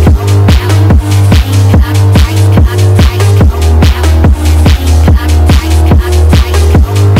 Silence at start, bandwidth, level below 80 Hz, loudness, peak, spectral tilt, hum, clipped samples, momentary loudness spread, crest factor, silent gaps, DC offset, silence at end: 0 s; 16 kHz; -10 dBFS; -7 LUFS; 0 dBFS; -6.5 dB/octave; none; 2%; 1 LU; 4 dB; none; under 0.1%; 0 s